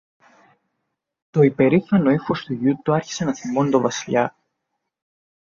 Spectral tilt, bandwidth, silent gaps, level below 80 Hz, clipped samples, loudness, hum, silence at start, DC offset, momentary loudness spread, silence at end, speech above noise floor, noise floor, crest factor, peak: -6.5 dB/octave; 7.4 kHz; none; -60 dBFS; under 0.1%; -20 LUFS; none; 1.35 s; under 0.1%; 9 LU; 1.15 s; 59 dB; -78 dBFS; 18 dB; -4 dBFS